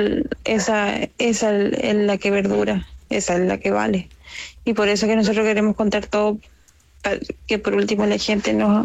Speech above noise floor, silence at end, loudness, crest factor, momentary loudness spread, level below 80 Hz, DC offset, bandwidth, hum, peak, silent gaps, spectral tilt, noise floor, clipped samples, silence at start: 32 dB; 0 s; -20 LUFS; 12 dB; 8 LU; -46 dBFS; under 0.1%; 9 kHz; none; -8 dBFS; none; -5 dB/octave; -52 dBFS; under 0.1%; 0 s